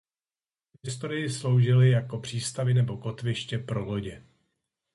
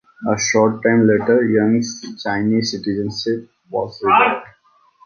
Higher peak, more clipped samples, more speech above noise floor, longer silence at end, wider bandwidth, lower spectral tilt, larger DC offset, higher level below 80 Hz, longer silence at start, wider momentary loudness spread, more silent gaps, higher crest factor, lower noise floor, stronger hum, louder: second, -12 dBFS vs -2 dBFS; neither; first, over 64 dB vs 39 dB; first, 0.75 s vs 0.6 s; first, 11.5 kHz vs 7 kHz; about the same, -6 dB/octave vs -5 dB/octave; neither; about the same, -58 dBFS vs -54 dBFS; first, 0.85 s vs 0.2 s; about the same, 14 LU vs 12 LU; neither; about the same, 16 dB vs 16 dB; first, under -90 dBFS vs -56 dBFS; neither; second, -27 LUFS vs -17 LUFS